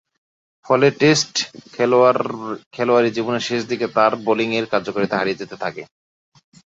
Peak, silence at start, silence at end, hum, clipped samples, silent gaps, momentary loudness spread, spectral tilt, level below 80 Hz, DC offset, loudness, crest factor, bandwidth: -2 dBFS; 0.7 s; 0.9 s; none; under 0.1%; 2.66-2.71 s; 13 LU; -4.5 dB/octave; -62 dBFS; under 0.1%; -19 LUFS; 18 dB; 8 kHz